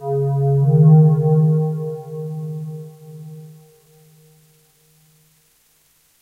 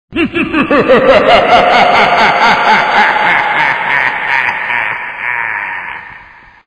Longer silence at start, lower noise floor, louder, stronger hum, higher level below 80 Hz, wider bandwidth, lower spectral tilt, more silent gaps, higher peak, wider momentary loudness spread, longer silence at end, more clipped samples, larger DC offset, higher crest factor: about the same, 0 s vs 0.1 s; first, -58 dBFS vs -37 dBFS; second, -16 LUFS vs -9 LUFS; neither; second, -60 dBFS vs -40 dBFS; second, 1.6 kHz vs 9.8 kHz; first, -11.5 dB/octave vs -4.5 dB/octave; neither; second, -4 dBFS vs 0 dBFS; first, 26 LU vs 10 LU; first, 2.7 s vs 0.45 s; second, under 0.1% vs 0.3%; neither; first, 16 dB vs 10 dB